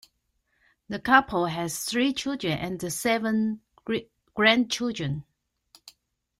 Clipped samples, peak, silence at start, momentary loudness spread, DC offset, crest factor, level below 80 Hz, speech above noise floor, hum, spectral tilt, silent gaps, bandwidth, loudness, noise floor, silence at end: under 0.1%; -4 dBFS; 0.9 s; 12 LU; under 0.1%; 22 dB; -60 dBFS; 48 dB; none; -4 dB/octave; none; 16 kHz; -26 LUFS; -74 dBFS; 0.5 s